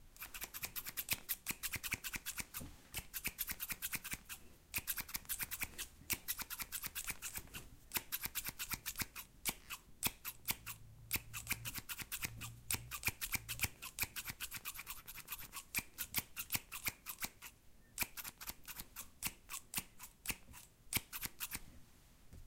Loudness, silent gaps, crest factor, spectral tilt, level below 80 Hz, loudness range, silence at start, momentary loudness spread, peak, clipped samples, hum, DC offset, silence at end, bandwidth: -43 LUFS; none; 30 dB; -1 dB/octave; -60 dBFS; 3 LU; 0 s; 9 LU; -16 dBFS; under 0.1%; none; under 0.1%; 0 s; 17 kHz